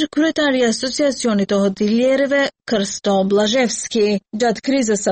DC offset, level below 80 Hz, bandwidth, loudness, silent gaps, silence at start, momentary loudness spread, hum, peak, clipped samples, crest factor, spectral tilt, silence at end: under 0.1%; -54 dBFS; 8.8 kHz; -17 LUFS; none; 0 s; 4 LU; none; -6 dBFS; under 0.1%; 10 dB; -4 dB/octave; 0 s